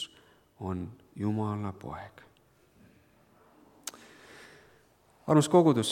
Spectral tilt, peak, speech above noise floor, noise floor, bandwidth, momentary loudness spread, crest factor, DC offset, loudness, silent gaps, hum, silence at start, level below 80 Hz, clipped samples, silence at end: -6 dB/octave; -8 dBFS; 36 dB; -64 dBFS; 16.5 kHz; 28 LU; 24 dB; under 0.1%; -28 LUFS; none; none; 0 s; -66 dBFS; under 0.1%; 0 s